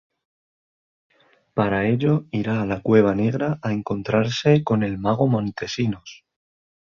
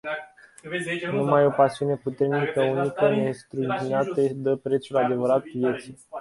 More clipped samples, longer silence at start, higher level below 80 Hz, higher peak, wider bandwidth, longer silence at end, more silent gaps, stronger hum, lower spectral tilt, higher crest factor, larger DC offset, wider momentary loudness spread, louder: neither; first, 1.55 s vs 0.05 s; first, -52 dBFS vs -66 dBFS; about the same, -4 dBFS vs -6 dBFS; second, 7.2 kHz vs 11.5 kHz; first, 0.8 s vs 0 s; neither; neither; about the same, -7 dB/octave vs -7 dB/octave; about the same, 20 dB vs 18 dB; neither; about the same, 8 LU vs 10 LU; first, -21 LUFS vs -24 LUFS